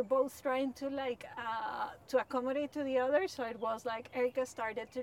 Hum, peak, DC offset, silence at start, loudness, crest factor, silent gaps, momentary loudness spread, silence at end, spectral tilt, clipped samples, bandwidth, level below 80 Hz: none; -18 dBFS; under 0.1%; 0 s; -36 LUFS; 16 dB; none; 7 LU; 0 s; -4 dB/octave; under 0.1%; 16.5 kHz; -74 dBFS